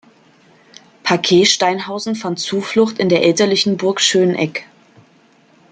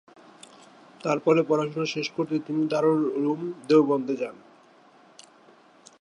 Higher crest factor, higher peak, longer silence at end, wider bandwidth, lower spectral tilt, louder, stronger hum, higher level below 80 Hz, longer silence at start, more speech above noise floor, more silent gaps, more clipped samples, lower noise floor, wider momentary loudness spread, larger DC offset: about the same, 16 dB vs 20 dB; first, 0 dBFS vs -8 dBFS; second, 1.1 s vs 1.65 s; second, 9.4 kHz vs 10.5 kHz; second, -3.5 dB/octave vs -6.5 dB/octave; first, -15 LUFS vs -25 LUFS; neither; first, -62 dBFS vs -80 dBFS; about the same, 1.05 s vs 1.05 s; first, 36 dB vs 31 dB; neither; neither; second, -51 dBFS vs -55 dBFS; about the same, 10 LU vs 10 LU; neither